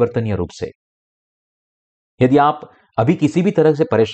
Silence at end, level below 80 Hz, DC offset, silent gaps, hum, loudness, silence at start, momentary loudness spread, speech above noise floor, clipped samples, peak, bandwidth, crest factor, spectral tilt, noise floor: 0 s; -50 dBFS; under 0.1%; 0.75-2.18 s; none; -16 LUFS; 0 s; 15 LU; over 74 dB; under 0.1%; -4 dBFS; 8.6 kHz; 14 dB; -8 dB/octave; under -90 dBFS